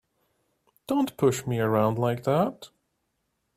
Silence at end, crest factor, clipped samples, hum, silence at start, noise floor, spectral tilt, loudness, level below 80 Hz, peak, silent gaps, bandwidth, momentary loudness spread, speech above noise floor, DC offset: 0.9 s; 18 dB; under 0.1%; none; 0.9 s; -77 dBFS; -6.5 dB/octave; -26 LUFS; -62 dBFS; -10 dBFS; none; 15.5 kHz; 6 LU; 52 dB; under 0.1%